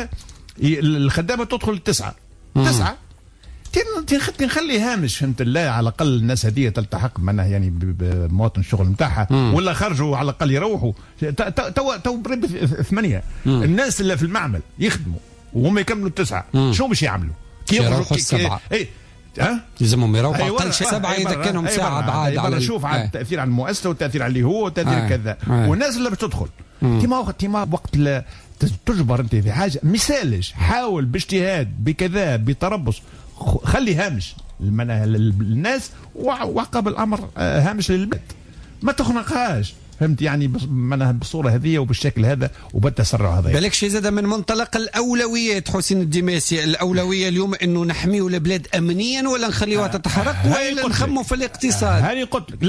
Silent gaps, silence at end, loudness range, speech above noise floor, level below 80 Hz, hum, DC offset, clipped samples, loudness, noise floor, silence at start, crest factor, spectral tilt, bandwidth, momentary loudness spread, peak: none; 0 s; 2 LU; 23 dB; -36 dBFS; none; under 0.1%; under 0.1%; -20 LUFS; -42 dBFS; 0 s; 14 dB; -5.5 dB/octave; 11 kHz; 6 LU; -6 dBFS